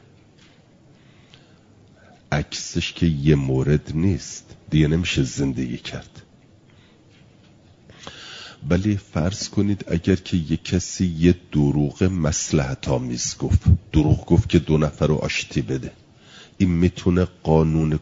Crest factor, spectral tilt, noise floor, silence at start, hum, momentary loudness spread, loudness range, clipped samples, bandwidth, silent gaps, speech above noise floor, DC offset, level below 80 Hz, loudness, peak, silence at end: 20 dB; -6 dB/octave; -52 dBFS; 2.3 s; none; 10 LU; 8 LU; under 0.1%; 7.8 kHz; none; 32 dB; under 0.1%; -38 dBFS; -21 LUFS; -2 dBFS; 0 s